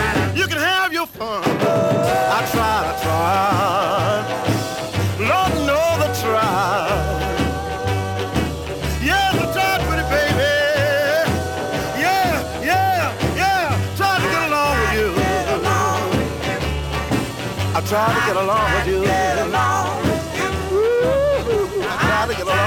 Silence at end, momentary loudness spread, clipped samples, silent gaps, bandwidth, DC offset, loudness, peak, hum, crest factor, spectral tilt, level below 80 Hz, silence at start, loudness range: 0 s; 5 LU; under 0.1%; none; 19.5 kHz; under 0.1%; -19 LUFS; -4 dBFS; none; 14 dB; -4.5 dB/octave; -34 dBFS; 0 s; 2 LU